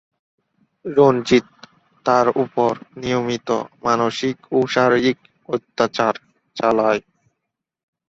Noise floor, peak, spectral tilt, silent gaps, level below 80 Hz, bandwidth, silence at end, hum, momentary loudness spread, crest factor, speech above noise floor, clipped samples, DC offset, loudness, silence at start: -80 dBFS; -2 dBFS; -5.5 dB/octave; none; -58 dBFS; 7.8 kHz; 1.1 s; none; 11 LU; 20 dB; 62 dB; under 0.1%; under 0.1%; -19 LUFS; 0.85 s